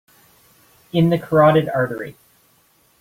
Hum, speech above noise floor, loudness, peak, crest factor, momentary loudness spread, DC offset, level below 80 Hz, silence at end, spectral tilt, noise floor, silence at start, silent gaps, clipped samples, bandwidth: none; 42 dB; -17 LUFS; -2 dBFS; 18 dB; 15 LU; under 0.1%; -54 dBFS; 0.9 s; -8 dB/octave; -58 dBFS; 0.95 s; none; under 0.1%; 16 kHz